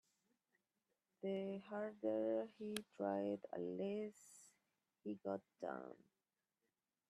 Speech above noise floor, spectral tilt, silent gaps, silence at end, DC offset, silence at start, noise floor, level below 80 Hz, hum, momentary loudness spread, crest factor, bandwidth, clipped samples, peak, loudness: over 45 dB; -6 dB/octave; none; 1.15 s; under 0.1%; 1.25 s; under -90 dBFS; under -90 dBFS; none; 14 LU; 22 dB; 13 kHz; under 0.1%; -26 dBFS; -46 LUFS